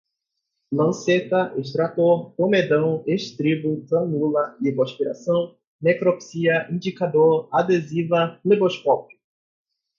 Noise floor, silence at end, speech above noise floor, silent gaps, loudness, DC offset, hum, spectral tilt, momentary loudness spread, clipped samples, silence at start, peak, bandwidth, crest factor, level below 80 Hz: -80 dBFS; 0.95 s; 59 dB; 5.67-5.79 s; -21 LUFS; under 0.1%; none; -6.5 dB/octave; 6 LU; under 0.1%; 0.7 s; -6 dBFS; 7.4 kHz; 16 dB; -68 dBFS